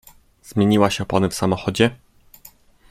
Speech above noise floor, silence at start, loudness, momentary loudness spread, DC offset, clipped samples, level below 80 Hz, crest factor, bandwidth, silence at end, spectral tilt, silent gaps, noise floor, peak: 31 dB; 0.5 s; -19 LUFS; 5 LU; under 0.1%; under 0.1%; -50 dBFS; 20 dB; 15.5 kHz; 0.95 s; -5.5 dB/octave; none; -49 dBFS; -2 dBFS